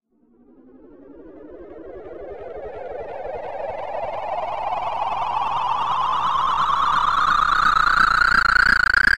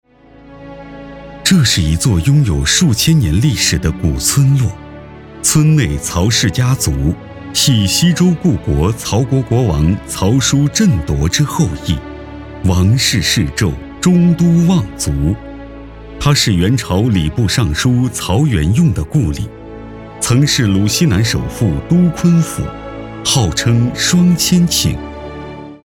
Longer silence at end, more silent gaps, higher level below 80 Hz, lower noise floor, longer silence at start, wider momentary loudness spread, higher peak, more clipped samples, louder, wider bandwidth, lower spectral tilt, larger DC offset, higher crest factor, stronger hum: about the same, 0 s vs 0.05 s; neither; second, -40 dBFS vs -28 dBFS; first, -56 dBFS vs -41 dBFS; second, 0 s vs 0.45 s; first, 21 LU vs 17 LU; about the same, 0 dBFS vs 0 dBFS; neither; second, -19 LUFS vs -13 LUFS; second, 15 kHz vs 18 kHz; second, -2.5 dB/octave vs -4.5 dB/octave; first, 1% vs under 0.1%; first, 20 dB vs 12 dB; neither